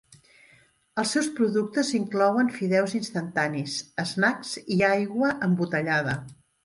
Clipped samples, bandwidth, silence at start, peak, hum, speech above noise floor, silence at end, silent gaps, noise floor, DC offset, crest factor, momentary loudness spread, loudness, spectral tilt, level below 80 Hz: under 0.1%; 11.5 kHz; 0.95 s; -10 dBFS; none; 35 dB; 0.3 s; none; -60 dBFS; under 0.1%; 16 dB; 8 LU; -25 LUFS; -5 dB/octave; -64 dBFS